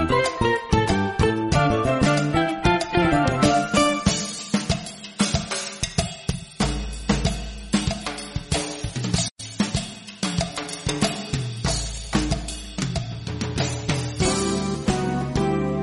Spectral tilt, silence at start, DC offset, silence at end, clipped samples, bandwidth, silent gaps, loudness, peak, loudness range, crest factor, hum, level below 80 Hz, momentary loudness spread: -4.5 dB/octave; 0 s; under 0.1%; 0 s; under 0.1%; 11.5 kHz; 9.31-9.36 s; -23 LUFS; -4 dBFS; 6 LU; 18 dB; none; -36 dBFS; 9 LU